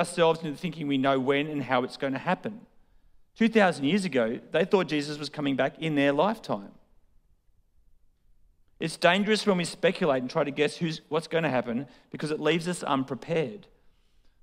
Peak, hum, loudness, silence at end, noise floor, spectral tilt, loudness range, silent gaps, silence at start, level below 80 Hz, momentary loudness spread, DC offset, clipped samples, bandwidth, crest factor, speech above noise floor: -6 dBFS; none; -27 LUFS; 0.85 s; -63 dBFS; -5.5 dB/octave; 4 LU; none; 0 s; -64 dBFS; 11 LU; under 0.1%; under 0.1%; 15 kHz; 22 dB; 36 dB